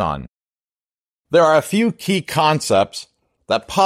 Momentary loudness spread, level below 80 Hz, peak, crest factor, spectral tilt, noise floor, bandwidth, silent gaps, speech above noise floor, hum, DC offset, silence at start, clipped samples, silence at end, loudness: 10 LU; -48 dBFS; -2 dBFS; 16 dB; -5 dB/octave; under -90 dBFS; 16 kHz; 0.28-0.40 s, 0.53-0.57 s, 0.64-0.68 s, 0.82-0.90 s, 1.00-1.24 s; over 73 dB; none; under 0.1%; 0 s; under 0.1%; 0 s; -17 LUFS